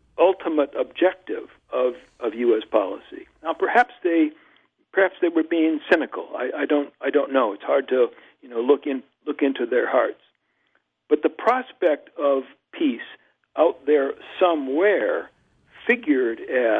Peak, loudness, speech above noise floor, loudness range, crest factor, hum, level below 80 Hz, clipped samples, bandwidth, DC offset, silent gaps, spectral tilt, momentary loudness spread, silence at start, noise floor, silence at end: -4 dBFS; -22 LUFS; 47 dB; 2 LU; 20 dB; none; -70 dBFS; under 0.1%; 6.2 kHz; under 0.1%; none; -5.5 dB/octave; 11 LU; 0.2 s; -69 dBFS; 0 s